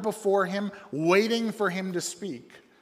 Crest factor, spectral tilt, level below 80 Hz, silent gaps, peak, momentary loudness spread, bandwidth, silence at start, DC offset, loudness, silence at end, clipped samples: 18 dB; -4.5 dB/octave; -78 dBFS; none; -8 dBFS; 13 LU; 15.5 kHz; 0 s; under 0.1%; -27 LUFS; 0.25 s; under 0.1%